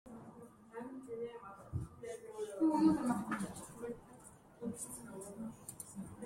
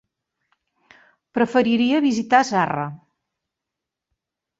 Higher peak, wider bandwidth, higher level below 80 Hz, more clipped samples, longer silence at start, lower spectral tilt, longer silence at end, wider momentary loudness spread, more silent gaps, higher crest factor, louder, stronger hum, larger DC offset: second, -20 dBFS vs -2 dBFS; first, 16 kHz vs 8 kHz; about the same, -66 dBFS vs -66 dBFS; neither; second, 0.05 s vs 1.35 s; about the same, -6 dB/octave vs -5 dB/octave; second, 0 s vs 1.65 s; first, 22 LU vs 11 LU; neither; about the same, 22 dB vs 22 dB; second, -40 LUFS vs -20 LUFS; neither; neither